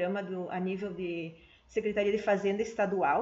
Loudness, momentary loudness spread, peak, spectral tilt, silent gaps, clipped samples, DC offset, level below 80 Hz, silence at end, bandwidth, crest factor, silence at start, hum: -32 LUFS; 8 LU; -16 dBFS; -5 dB/octave; none; under 0.1%; under 0.1%; -64 dBFS; 0 s; 7.8 kHz; 16 dB; 0 s; none